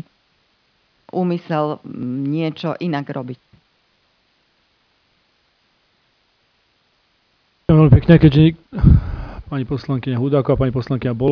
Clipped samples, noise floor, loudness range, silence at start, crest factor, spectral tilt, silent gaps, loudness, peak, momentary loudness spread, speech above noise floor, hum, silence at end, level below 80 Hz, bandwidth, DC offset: under 0.1%; -62 dBFS; 15 LU; 1.15 s; 18 dB; -10.5 dB/octave; none; -17 LUFS; 0 dBFS; 17 LU; 46 dB; none; 0 s; -30 dBFS; 5.4 kHz; under 0.1%